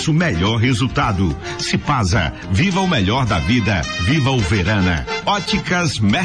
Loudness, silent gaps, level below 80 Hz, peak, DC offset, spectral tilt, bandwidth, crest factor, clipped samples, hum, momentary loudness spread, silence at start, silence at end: -17 LUFS; none; -32 dBFS; -8 dBFS; 0.3%; -5 dB/octave; 10.5 kHz; 10 dB; under 0.1%; none; 4 LU; 0 s; 0 s